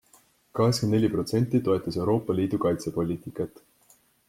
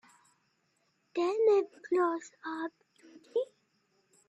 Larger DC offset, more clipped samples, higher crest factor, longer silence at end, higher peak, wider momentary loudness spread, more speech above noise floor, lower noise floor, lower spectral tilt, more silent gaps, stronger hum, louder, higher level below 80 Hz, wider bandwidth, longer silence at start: neither; neither; about the same, 18 dB vs 18 dB; about the same, 0.8 s vs 0.85 s; first, -10 dBFS vs -16 dBFS; second, 10 LU vs 14 LU; second, 36 dB vs 45 dB; second, -62 dBFS vs -75 dBFS; first, -7 dB/octave vs -4 dB/octave; neither; neither; first, -26 LUFS vs -32 LUFS; first, -58 dBFS vs -84 dBFS; first, 16 kHz vs 8.6 kHz; second, 0.55 s vs 1.15 s